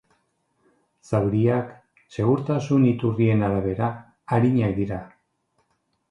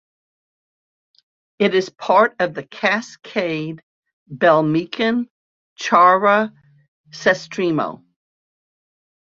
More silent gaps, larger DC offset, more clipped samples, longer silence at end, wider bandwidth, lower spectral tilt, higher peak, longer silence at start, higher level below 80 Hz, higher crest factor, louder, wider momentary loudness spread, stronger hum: second, none vs 3.83-4.03 s, 4.13-4.26 s, 5.30-5.76 s, 6.88-7.04 s; neither; neither; second, 1.05 s vs 1.4 s; first, 8.8 kHz vs 7.6 kHz; first, -9 dB/octave vs -5.5 dB/octave; second, -6 dBFS vs -2 dBFS; second, 1.1 s vs 1.6 s; first, -50 dBFS vs -66 dBFS; about the same, 18 dB vs 20 dB; second, -23 LUFS vs -18 LUFS; second, 10 LU vs 14 LU; neither